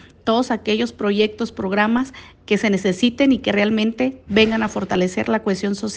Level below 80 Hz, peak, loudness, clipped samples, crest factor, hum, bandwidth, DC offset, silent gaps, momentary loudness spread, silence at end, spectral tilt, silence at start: -50 dBFS; -2 dBFS; -19 LUFS; under 0.1%; 16 dB; none; 9.4 kHz; under 0.1%; none; 6 LU; 0 s; -5 dB/octave; 0.25 s